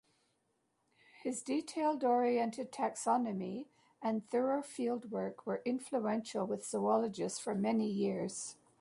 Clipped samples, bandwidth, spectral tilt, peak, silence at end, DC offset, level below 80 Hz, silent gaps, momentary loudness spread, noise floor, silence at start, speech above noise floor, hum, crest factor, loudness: under 0.1%; 11.5 kHz; -5 dB/octave; -20 dBFS; 0.3 s; under 0.1%; -82 dBFS; none; 9 LU; -80 dBFS; 1.2 s; 44 dB; none; 16 dB; -36 LUFS